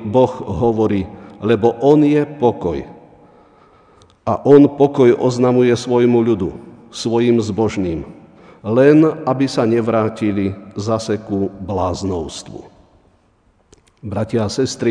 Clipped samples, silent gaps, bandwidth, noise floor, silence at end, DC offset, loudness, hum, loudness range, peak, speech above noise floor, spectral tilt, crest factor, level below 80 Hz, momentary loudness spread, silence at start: under 0.1%; none; 10 kHz; -56 dBFS; 0 s; under 0.1%; -16 LUFS; none; 9 LU; 0 dBFS; 41 dB; -7 dB/octave; 16 dB; -46 dBFS; 16 LU; 0 s